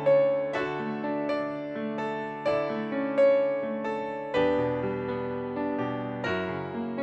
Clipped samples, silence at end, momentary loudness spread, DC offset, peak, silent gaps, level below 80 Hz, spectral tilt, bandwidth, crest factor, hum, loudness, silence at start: under 0.1%; 0 s; 10 LU; under 0.1%; -12 dBFS; none; -60 dBFS; -7.5 dB/octave; 8 kHz; 14 dB; none; -29 LUFS; 0 s